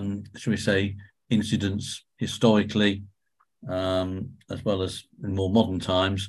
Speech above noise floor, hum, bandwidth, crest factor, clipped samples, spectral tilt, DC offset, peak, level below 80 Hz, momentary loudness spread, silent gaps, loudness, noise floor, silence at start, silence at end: 46 dB; none; 12.5 kHz; 20 dB; under 0.1%; -5.5 dB/octave; under 0.1%; -6 dBFS; -46 dBFS; 14 LU; none; -26 LUFS; -71 dBFS; 0 s; 0 s